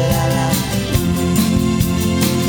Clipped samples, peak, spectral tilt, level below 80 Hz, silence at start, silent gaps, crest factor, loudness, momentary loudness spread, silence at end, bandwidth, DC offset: under 0.1%; -2 dBFS; -5.5 dB/octave; -30 dBFS; 0 s; none; 14 dB; -16 LUFS; 2 LU; 0 s; over 20 kHz; under 0.1%